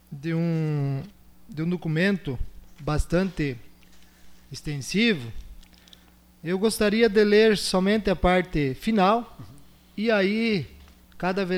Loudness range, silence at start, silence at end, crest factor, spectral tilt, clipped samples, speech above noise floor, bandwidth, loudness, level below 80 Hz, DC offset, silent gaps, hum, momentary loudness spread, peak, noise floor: 7 LU; 0.1 s; 0 s; 18 dB; -6 dB/octave; under 0.1%; 30 dB; 16.5 kHz; -24 LUFS; -42 dBFS; under 0.1%; none; none; 18 LU; -8 dBFS; -54 dBFS